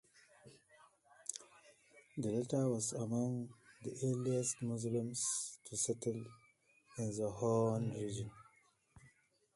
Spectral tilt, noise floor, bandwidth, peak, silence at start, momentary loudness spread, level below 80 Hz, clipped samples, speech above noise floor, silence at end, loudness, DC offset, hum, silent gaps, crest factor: -5.5 dB/octave; -72 dBFS; 11.5 kHz; -20 dBFS; 0.45 s; 14 LU; -74 dBFS; under 0.1%; 33 dB; 0.5 s; -39 LUFS; under 0.1%; none; none; 22 dB